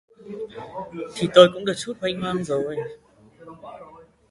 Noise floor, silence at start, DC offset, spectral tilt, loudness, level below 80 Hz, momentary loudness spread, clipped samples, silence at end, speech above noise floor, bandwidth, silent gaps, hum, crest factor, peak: -46 dBFS; 0.25 s; under 0.1%; -5 dB/octave; -21 LUFS; -60 dBFS; 26 LU; under 0.1%; 0.35 s; 25 dB; 11.5 kHz; none; none; 24 dB; 0 dBFS